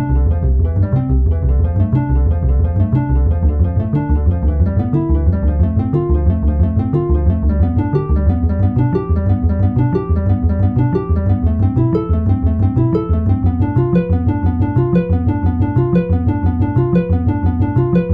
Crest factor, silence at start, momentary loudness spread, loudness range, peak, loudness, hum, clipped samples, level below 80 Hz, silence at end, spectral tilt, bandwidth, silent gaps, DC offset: 12 dB; 0 s; 2 LU; 0 LU; -2 dBFS; -15 LUFS; none; under 0.1%; -20 dBFS; 0 s; -12.5 dB/octave; 3.6 kHz; none; 0.1%